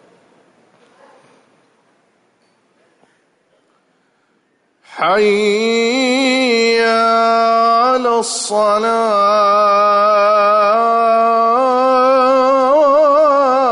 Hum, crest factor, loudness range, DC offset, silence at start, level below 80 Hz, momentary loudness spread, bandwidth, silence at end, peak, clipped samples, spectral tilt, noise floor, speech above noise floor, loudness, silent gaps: none; 10 dB; 7 LU; under 0.1%; 4.9 s; -64 dBFS; 3 LU; 11 kHz; 0 s; -4 dBFS; under 0.1%; -3 dB/octave; -60 dBFS; 48 dB; -12 LUFS; none